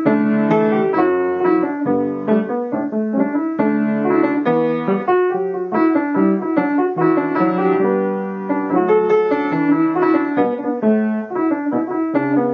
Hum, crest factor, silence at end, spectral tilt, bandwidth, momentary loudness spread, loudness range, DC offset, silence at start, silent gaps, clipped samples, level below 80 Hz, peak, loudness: none; 14 dB; 0 s; -10 dB/octave; 5.4 kHz; 5 LU; 1 LU; under 0.1%; 0 s; none; under 0.1%; -72 dBFS; -2 dBFS; -17 LUFS